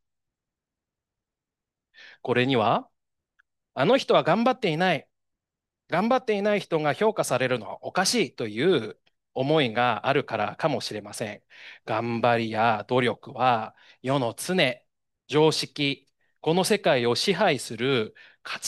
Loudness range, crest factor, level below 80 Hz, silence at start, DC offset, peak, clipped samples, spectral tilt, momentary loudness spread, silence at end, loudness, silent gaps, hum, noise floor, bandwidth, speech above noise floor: 3 LU; 18 dB; -72 dBFS; 2.05 s; under 0.1%; -8 dBFS; under 0.1%; -4.5 dB/octave; 13 LU; 0 s; -25 LUFS; none; none; -88 dBFS; 12.5 kHz; 64 dB